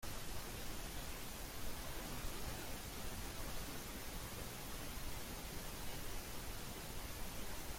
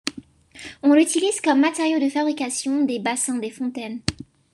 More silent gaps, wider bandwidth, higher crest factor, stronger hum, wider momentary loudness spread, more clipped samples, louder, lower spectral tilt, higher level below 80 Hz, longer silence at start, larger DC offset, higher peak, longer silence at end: neither; first, 16.5 kHz vs 12.5 kHz; second, 14 dB vs 20 dB; neither; second, 1 LU vs 12 LU; neither; second, -48 LUFS vs -21 LUFS; about the same, -3 dB/octave vs -3.5 dB/octave; about the same, -52 dBFS vs -54 dBFS; about the same, 0 s vs 0.05 s; neither; second, -30 dBFS vs -2 dBFS; second, 0 s vs 0.3 s